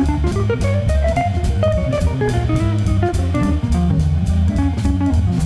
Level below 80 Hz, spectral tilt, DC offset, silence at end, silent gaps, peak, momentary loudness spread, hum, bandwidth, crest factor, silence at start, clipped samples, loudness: -22 dBFS; -7.5 dB/octave; under 0.1%; 0 s; none; -6 dBFS; 1 LU; none; 11 kHz; 10 dB; 0 s; under 0.1%; -18 LUFS